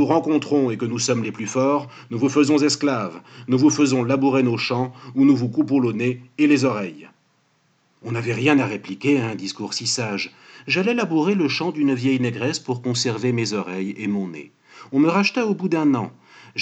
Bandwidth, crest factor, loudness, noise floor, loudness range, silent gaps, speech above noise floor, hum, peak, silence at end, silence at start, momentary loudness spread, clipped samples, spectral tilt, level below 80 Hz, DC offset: 9 kHz; 18 dB; -21 LUFS; -63 dBFS; 4 LU; none; 43 dB; none; -2 dBFS; 0 s; 0 s; 11 LU; under 0.1%; -5 dB/octave; -84 dBFS; under 0.1%